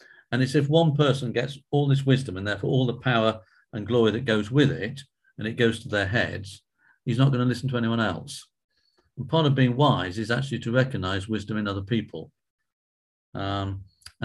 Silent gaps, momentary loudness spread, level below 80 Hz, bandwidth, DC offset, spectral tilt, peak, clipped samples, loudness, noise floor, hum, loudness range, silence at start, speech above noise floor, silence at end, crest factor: 8.64-8.69 s, 12.50-12.58 s, 12.73-13.33 s; 15 LU; -52 dBFS; 12 kHz; under 0.1%; -6.5 dB/octave; -6 dBFS; under 0.1%; -25 LUFS; under -90 dBFS; none; 5 LU; 0.3 s; over 66 dB; 0 s; 20 dB